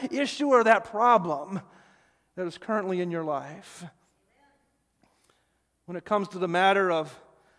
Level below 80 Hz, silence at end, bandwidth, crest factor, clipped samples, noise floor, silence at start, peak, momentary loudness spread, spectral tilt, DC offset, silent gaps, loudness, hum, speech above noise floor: -74 dBFS; 0.45 s; 11 kHz; 22 dB; under 0.1%; -72 dBFS; 0 s; -6 dBFS; 19 LU; -5 dB/octave; under 0.1%; none; -25 LUFS; none; 47 dB